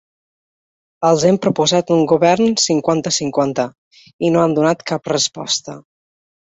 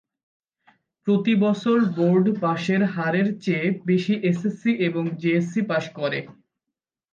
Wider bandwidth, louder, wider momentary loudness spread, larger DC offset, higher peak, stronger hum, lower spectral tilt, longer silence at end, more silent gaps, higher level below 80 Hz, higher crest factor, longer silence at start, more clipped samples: first, 8.2 kHz vs 7.4 kHz; first, -16 LUFS vs -22 LUFS; about the same, 7 LU vs 6 LU; neither; first, -2 dBFS vs -10 dBFS; neither; second, -4 dB/octave vs -7.5 dB/octave; about the same, 0.7 s vs 0.8 s; first, 3.78-3.91 s, 4.13-4.19 s vs none; first, -56 dBFS vs -70 dBFS; about the same, 16 dB vs 14 dB; about the same, 1 s vs 1.05 s; neither